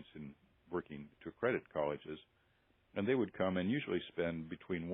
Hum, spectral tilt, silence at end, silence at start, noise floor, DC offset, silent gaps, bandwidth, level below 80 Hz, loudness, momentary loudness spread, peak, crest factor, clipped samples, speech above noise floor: none; -5.5 dB/octave; 0 s; 0 s; -74 dBFS; under 0.1%; none; 3.9 kHz; -72 dBFS; -39 LUFS; 16 LU; -20 dBFS; 20 dB; under 0.1%; 36 dB